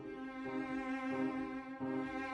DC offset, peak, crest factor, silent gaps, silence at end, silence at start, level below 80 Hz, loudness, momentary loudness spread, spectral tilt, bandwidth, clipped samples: under 0.1%; -26 dBFS; 14 dB; none; 0 s; 0 s; -68 dBFS; -41 LUFS; 6 LU; -6.5 dB/octave; 9.8 kHz; under 0.1%